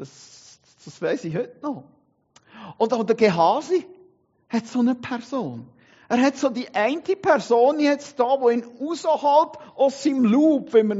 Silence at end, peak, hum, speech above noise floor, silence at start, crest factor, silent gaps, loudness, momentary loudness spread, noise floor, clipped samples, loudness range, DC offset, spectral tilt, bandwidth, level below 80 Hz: 0 s; -4 dBFS; none; 38 dB; 0 s; 18 dB; none; -22 LUFS; 12 LU; -59 dBFS; under 0.1%; 5 LU; under 0.1%; -4.5 dB/octave; 8 kHz; -72 dBFS